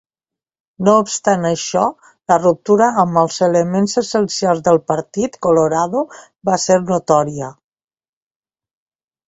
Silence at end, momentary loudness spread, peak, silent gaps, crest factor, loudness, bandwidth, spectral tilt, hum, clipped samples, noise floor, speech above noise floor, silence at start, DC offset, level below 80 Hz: 1.75 s; 9 LU; 0 dBFS; none; 16 dB; -16 LUFS; 8.2 kHz; -5 dB/octave; none; under 0.1%; -88 dBFS; 72 dB; 0.8 s; under 0.1%; -56 dBFS